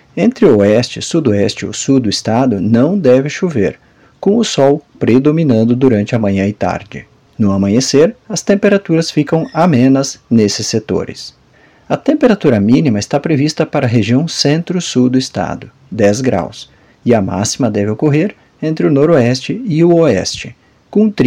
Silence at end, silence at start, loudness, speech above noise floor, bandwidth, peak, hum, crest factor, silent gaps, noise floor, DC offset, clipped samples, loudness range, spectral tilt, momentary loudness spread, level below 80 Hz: 0 s; 0.15 s; -13 LUFS; 34 dB; 12 kHz; 0 dBFS; none; 12 dB; none; -46 dBFS; under 0.1%; under 0.1%; 2 LU; -6 dB/octave; 9 LU; -48 dBFS